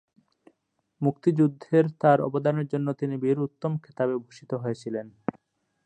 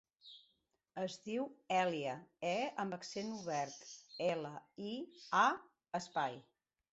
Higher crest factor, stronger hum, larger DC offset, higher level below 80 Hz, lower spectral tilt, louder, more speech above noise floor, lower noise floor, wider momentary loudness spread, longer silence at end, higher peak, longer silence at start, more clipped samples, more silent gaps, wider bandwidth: about the same, 20 dB vs 22 dB; neither; neither; first, -72 dBFS vs -84 dBFS; first, -9 dB/octave vs -3 dB/octave; first, -26 LUFS vs -40 LUFS; first, 49 dB vs 41 dB; second, -75 dBFS vs -80 dBFS; second, 13 LU vs 18 LU; first, 0.75 s vs 0.5 s; first, -6 dBFS vs -18 dBFS; first, 1 s vs 0.25 s; neither; neither; first, 9 kHz vs 8 kHz